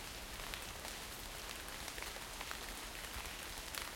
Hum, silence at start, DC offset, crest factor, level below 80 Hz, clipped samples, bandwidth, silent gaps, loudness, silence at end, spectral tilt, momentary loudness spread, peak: none; 0 s; under 0.1%; 26 dB; -56 dBFS; under 0.1%; 17 kHz; none; -45 LUFS; 0 s; -1.5 dB/octave; 2 LU; -20 dBFS